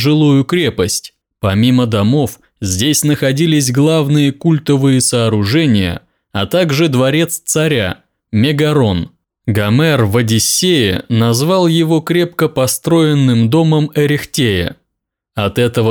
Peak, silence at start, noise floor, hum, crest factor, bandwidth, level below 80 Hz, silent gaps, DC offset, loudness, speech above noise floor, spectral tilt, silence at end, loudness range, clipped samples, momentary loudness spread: -2 dBFS; 0 s; -75 dBFS; none; 10 dB; over 20 kHz; -46 dBFS; none; under 0.1%; -13 LUFS; 63 dB; -5 dB/octave; 0 s; 2 LU; under 0.1%; 9 LU